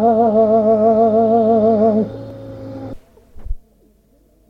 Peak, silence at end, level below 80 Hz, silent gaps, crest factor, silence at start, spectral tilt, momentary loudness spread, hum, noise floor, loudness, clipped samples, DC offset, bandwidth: -4 dBFS; 0.95 s; -38 dBFS; none; 12 dB; 0 s; -10.5 dB/octave; 21 LU; none; -54 dBFS; -14 LUFS; under 0.1%; under 0.1%; 5.4 kHz